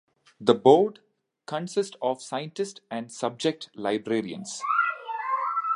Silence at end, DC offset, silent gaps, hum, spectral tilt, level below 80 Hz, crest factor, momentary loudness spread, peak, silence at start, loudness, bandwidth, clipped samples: 0 s; under 0.1%; none; none; -5 dB/octave; -76 dBFS; 24 dB; 14 LU; -4 dBFS; 0.4 s; -26 LUFS; 11.5 kHz; under 0.1%